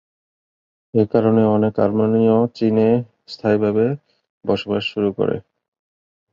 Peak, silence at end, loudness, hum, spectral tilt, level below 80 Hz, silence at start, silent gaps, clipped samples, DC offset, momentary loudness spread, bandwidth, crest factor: -2 dBFS; 0.95 s; -18 LUFS; none; -9 dB/octave; -56 dBFS; 0.95 s; 4.30-4.41 s; under 0.1%; under 0.1%; 8 LU; 7 kHz; 18 dB